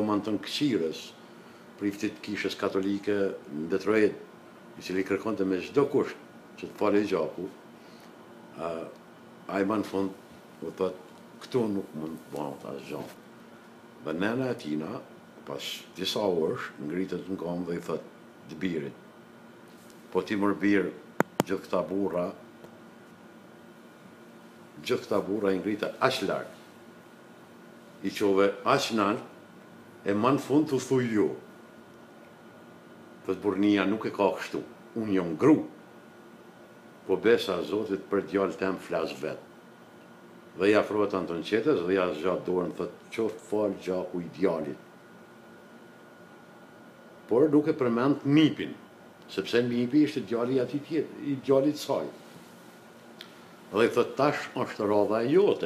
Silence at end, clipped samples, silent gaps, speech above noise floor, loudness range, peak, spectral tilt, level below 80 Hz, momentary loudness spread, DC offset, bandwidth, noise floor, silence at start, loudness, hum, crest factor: 0 s; under 0.1%; none; 23 dB; 8 LU; -2 dBFS; -6 dB/octave; -72 dBFS; 23 LU; under 0.1%; 15 kHz; -51 dBFS; 0 s; -29 LUFS; none; 28 dB